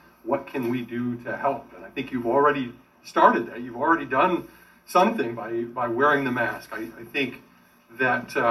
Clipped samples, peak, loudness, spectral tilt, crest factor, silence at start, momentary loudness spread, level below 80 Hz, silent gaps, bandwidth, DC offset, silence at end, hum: under 0.1%; -2 dBFS; -24 LUFS; -6 dB/octave; 22 dB; 0.25 s; 12 LU; -62 dBFS; none; 13.5 kHz; under 0.1%; 0 s; none